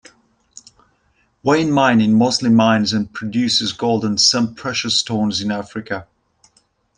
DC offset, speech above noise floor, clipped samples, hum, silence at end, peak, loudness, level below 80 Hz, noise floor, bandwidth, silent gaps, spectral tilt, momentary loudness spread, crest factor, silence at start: under 0.1%; 45 dB; under 0.1%; none; 0.95 s; -2 dBFS; -16 LUFS; -56 dBFS; -62 dBFS; 10 kHz; none; -4 dB/octave; 11 LU; 16 dB; 1.45 s